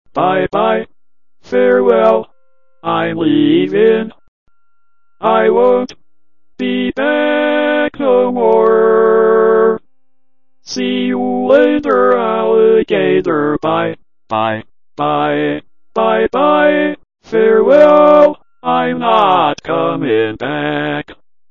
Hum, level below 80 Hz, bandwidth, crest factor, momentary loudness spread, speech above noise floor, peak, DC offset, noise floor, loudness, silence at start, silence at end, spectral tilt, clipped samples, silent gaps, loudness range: none; -52 dBFS; 6.8 kHz; 12 dB; 10 LU; 61 dB; 0 dBFS; 0.9%; -73 dBFS; -12 LUFS; 0.15 s; 0.4 s; -6.5 dB/octave; under 0.1%; 4.28-4.46 s; 5 LU